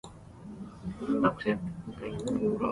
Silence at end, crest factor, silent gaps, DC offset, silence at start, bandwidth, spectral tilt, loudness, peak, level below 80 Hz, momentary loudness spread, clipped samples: 0 s; 22 dB; none; under 0.1%; 0.05 s; 11.5 kHz; -7 dB/octave; -32 LUFS; -10 dBFS; -54 dBFS; 18 LU; under 0.1%